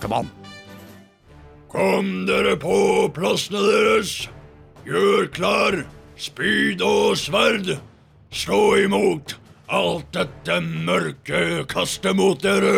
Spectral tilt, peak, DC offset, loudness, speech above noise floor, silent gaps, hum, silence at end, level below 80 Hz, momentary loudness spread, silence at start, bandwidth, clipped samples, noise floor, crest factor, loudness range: -4.5 dB/octave; -6 dBFS; under 0.1%; -20 LUFS; 27 dB; none; none; 0 s; -50 dBFS; 15 LU; 0 s; 16.5 kHz; under 0.1%; -47 dBFS; 16 dB; 2 LU